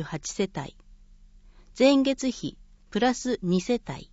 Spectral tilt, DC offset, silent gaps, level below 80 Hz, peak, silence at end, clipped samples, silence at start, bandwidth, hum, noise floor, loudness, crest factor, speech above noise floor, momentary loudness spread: -5 dB/octave; under 0.1%; none; -52 dBFS; -8 dBFS; 0.1 s; under 0.1%; 0 s; 8 kHz; none; -52 dBFS; -26 LUFS; 20 dB; 26 dB; 16 LU